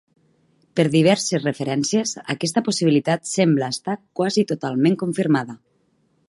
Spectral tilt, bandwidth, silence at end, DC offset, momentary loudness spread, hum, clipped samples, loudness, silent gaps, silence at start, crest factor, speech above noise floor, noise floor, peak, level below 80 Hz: -5 dB/octave; 11.5 kHz; 0.7 s; under 0.1%; 8 LU; none; under 0.1%; -21 LUFS; none; 0.75 s; 18 dB; 44 dB; -64 dBFS; -4 dBFS; -66 dBFS